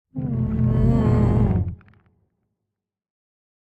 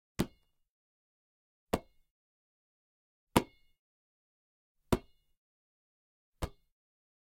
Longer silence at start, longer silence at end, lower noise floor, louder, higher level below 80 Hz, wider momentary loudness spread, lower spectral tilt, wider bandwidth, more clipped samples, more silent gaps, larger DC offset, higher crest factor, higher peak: about the same, 0.15 s vs 0.2 s; first, 1.85 s vs 0.8 s; first, -82 dBFS vs -55 dBFS; first, -21 LUFS vs -37 LUFS; first, -32 dBFS vs -54 dBFS; second, 8 LU vs 12 LU; first, -11 dB/octave vs -5 dB/octave; second, 4.6 kHz vs 16 kHz; neither; second, none vs 0.69-1.67 s, 2.11-3.27 s, 3.79-4.75 s, 5.37-6.33 s; neither; second, 16 dB vs 36 dB; about the same, -6 dBFS vs -6 dBFS